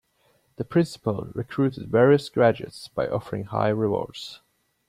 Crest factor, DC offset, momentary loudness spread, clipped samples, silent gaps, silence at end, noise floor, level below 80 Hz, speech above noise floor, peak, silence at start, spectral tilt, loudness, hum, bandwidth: 18 dB; under 0.1%; 15 LU; under 0.1%; none; 0.55 s; -65 dBFS; -58 dBFS; 42 dB; -6 dBFS; 0.6 s; -7.5 dB/octave; -24 LUFS; none; 14.5 kHz